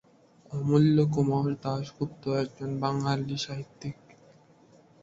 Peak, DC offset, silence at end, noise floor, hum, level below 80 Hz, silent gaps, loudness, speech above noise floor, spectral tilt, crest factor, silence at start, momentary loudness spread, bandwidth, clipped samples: -12 dBFS; under 0.1%; 1.1 s; -58 dBFS; none; -62 dBFS; none; -28 LUFS; 31 dB; -7.5 dB/octave; 18 dB; 0.5 s; 16 LU; 7.8 kHz; under 0.1%